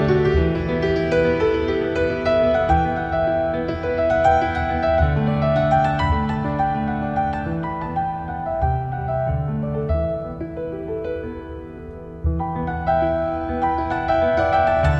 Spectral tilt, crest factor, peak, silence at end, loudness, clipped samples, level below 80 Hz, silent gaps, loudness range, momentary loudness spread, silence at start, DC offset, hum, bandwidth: -8 dB/octave; 16 dB; -4 dBFS; 0 s; -21 LUFS; under 0.1%; -32 dBFS; none; 6 LU; 10 LU; 0 s; under 0.1%; none; 7.8 kHz